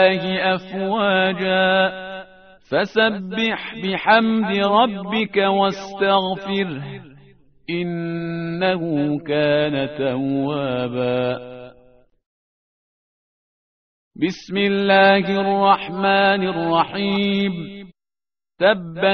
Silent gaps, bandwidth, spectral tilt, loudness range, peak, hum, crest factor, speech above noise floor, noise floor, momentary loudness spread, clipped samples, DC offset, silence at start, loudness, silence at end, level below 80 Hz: 12.26-14.11 s; 6.4 kHz; -3 dB/octave; 9 LU; 0 dBFS; none; 20 dB; over 71 dB; under -90 dBFS; 10 LU; under 0.1%; 0.1%; 0 s; -19 LUFS; 0 s; -58 dBFS